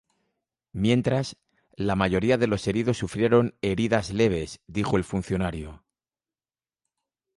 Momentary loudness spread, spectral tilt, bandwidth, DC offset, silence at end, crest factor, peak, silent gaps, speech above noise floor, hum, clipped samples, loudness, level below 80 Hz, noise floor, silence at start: 9 LU; -6.5 dB/octave; 11.5 kHz; under 0.1%; 1.6 s; 20 dB; -8 dBFS; none; over 66 dB; none; under 0.1%; -25 LUFS; -46 dBFS; under -90 dBFS; 0.75 s